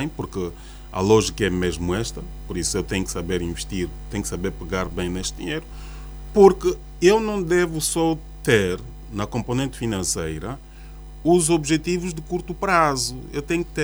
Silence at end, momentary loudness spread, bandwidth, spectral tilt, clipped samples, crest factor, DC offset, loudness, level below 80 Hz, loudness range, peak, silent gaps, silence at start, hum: 0 s; 14 LU; over 20 kHz; -4.5 dB/octave; under 0.1%; 22 dB; under 0.1%; -22 LUFS; -36 dBFS; 7 LU; 0 dBFS; none; 0 s; none